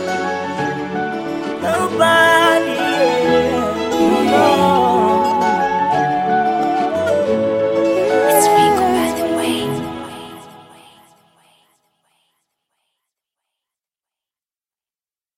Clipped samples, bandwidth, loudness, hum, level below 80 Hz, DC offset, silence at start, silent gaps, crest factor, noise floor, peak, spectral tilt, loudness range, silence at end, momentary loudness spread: under 0.1%; 17 kHz; -15 LUFS; none; -50 dBFS; under 0.1%; 0 s; none; 16 dB; under -90 dBFS; 0 dBFS; -4 dB/octave; 9 LU; 4.75 s; 10 LU